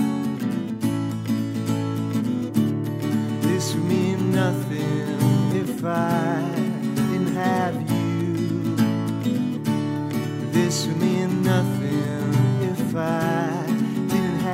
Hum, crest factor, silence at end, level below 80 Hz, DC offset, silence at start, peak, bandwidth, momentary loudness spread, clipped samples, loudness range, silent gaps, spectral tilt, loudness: none; 14 dB; 0 s; -62 dBFS; under 0.1%; 0 s; -8 dBFS; 16 kHz; 4 LU; under 0.1%; 2 LU; none; -6.5 dB/octave; -23 LUFS